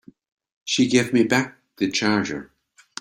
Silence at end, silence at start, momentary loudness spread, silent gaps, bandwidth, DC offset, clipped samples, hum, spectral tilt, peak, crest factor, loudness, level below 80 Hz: 0.55 s; 0.65 s; 16 LU; none; 15.5 kHz; under 0.1%; under 0.1%; none; -4 dB/octave; -4 dBFS; 18 dB; -21 LUFS; -60 dBFS